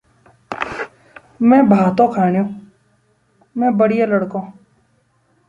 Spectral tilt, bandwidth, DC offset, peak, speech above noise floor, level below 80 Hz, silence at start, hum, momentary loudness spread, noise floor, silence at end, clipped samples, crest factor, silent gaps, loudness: -9 dB/octave; 7.6 kHz; under 0.1%; 0 dBFS; 46 dB; -58 dBFS; 0.5 s; none; 19 LU; -60 dBFS; 1 s; under 0.1%; 18 dB; none; -16 LUFS